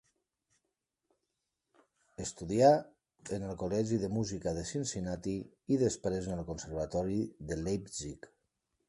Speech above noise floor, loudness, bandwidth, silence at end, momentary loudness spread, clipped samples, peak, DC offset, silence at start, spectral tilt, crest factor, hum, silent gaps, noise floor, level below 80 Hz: 53 dB; -34 LUFS; 11.5 kHz; 0.6 s; 15 LU; under 0.1%; -12 dBFS; under 0.1%; 2.2 s; -6 dB/octave; 24 dB; none; none; -86 dBFS; -56 dBFS